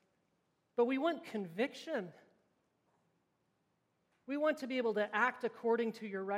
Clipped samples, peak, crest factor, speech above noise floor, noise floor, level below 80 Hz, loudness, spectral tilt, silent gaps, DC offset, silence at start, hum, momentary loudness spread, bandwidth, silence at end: under 0.1%; -18 dBFS; 20 dB; 44 dB; -80 dBFS; under -90 dBFS; -37 LUFS; -5.5 dB/octave; none; under 0.1%; 0.75 s; none; 9 LU; 14.5 kHz; 0 s